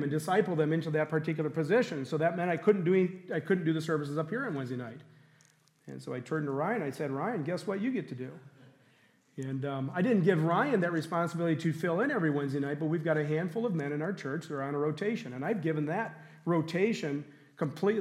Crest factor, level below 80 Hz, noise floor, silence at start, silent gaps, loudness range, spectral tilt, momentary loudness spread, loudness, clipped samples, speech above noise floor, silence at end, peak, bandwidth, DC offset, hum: 20 dB; -82 dBFS; -65 dBFS; 0 s; none; 6 LU; -7.5 dB/octave; 11 LU; -31 LUFS; under 0.1%; 35 dB; 0 s; -12 dBFS; 13.5 kHz; under 0.1%; none